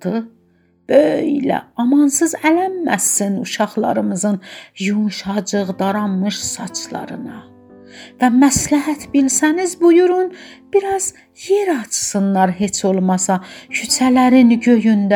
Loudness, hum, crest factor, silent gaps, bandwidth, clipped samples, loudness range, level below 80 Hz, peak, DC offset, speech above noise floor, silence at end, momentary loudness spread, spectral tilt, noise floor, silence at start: -16 LUFS; none; 16 dB; none; 20 kHz; under 0.1%; 5 LU; -52 dBFS; 0 dBFS; under 0.1%; 35 dB; 0 s; 12 LU; -4.5 dB/octave; -51 dBFS; 0.05 s